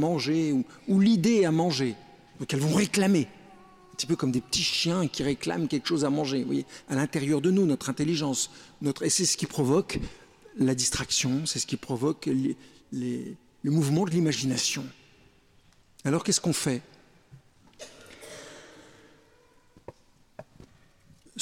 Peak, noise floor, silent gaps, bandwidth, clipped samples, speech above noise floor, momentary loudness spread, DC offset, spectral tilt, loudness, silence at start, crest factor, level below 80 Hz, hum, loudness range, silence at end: -12 dBFS; -60 dBFS; none; 16.5 kHz; under 0.1%; 34 dB; 19 LU; under 0.1%; -4.5 dB/octave; -27 LUFS; 0 s; 16 dB; -56 dBFS; none; 6 LU; 0 s